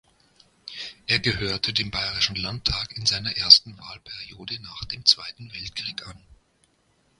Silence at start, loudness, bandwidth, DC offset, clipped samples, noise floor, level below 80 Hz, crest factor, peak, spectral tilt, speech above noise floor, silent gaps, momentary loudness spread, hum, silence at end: 0.65 s; -21 LUFS; 16 kHz; under 0.1%; under 0.1%; -66 dBFS; -48 dBFS; 26 dB; 0 dBFS; -2 dB/octave; 41 dB; none; 23 LU; none; 1 s